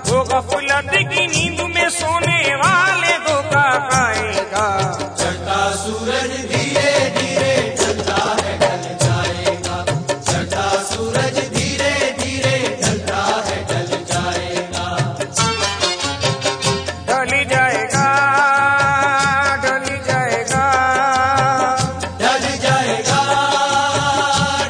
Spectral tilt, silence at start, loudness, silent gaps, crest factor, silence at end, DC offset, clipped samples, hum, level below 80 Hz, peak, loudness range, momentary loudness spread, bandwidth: -3.5 dB/octave; 0 s; -16 LUFS; none; 16 dB; 0 s; under 0.1%; under 0.1%; none; -44 dBFS; -2 dBFS; 4 LU; 6 LU; 10.5 kHz